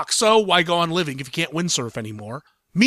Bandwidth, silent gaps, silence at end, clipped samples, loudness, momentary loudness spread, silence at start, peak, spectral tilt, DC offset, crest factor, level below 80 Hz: 15 kHz; none; 0 s; under 0.1%; -20 LUFS; 17 LU; 0 s; -4 dBFS; -3.5 dB/octave; under 0.1%; 18 dB; -62 dBFS